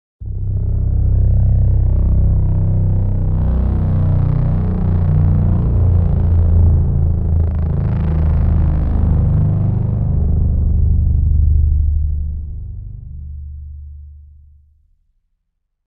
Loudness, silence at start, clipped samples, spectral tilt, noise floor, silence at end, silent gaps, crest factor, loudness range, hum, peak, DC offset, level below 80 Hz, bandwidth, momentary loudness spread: -16 LUFS; 0.2 s; under 0.1%; -13 dB/octave; -70 dBFS; 1.65 s; none; 12 dB; 8 LU; none; -2 dBFS; under 0.1%; -18 dBFS; 2.4 kHz; 15 LU